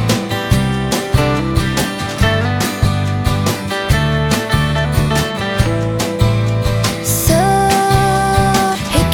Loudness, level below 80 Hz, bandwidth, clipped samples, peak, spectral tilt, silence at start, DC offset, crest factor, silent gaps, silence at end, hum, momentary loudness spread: -15 LUFS; -24 dBFS; 18 kHz; under 0.1%; 0 dBFS; -5 dB/octave; 0 s; under 0.1%; 14 dB; none; 0 s; none; 5 LU